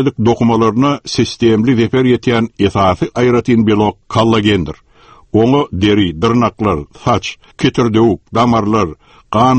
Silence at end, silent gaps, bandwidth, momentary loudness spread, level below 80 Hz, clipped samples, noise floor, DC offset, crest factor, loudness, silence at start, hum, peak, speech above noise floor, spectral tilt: 0 s; none; 8.6 kHz; 6 LU; -38 dBFS; under 0.1%; -43 dBFS; under 0.1%; 12 dB; -13 LUFS; 0 s; none; 0 dBFS; 31 dB; -6.5 dB/octave